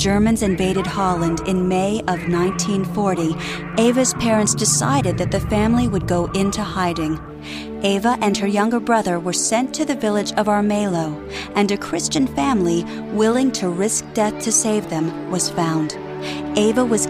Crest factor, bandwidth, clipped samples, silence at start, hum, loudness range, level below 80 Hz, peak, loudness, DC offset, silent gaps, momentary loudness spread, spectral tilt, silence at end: 16 dB; 16 kHz; under 0.1%; 0 s; none; 2 LU; -40 dBFS; -2 dBFS; -19 LUFS; under 0.1%; none; 7 LU; -4.5 dB/octave; 0 s